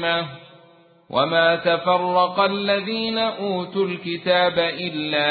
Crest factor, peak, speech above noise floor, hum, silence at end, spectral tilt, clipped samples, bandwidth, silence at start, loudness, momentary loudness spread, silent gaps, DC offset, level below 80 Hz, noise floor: 16 dB; -4 dBFS; 31 dB; none; 0 s; -9.5 dB/octave; under 0.1%; 4.8 kHz; 0 s; -21 LUFS; 8 LU; none; under 0.1%; -62 dBFS; -52 dBFS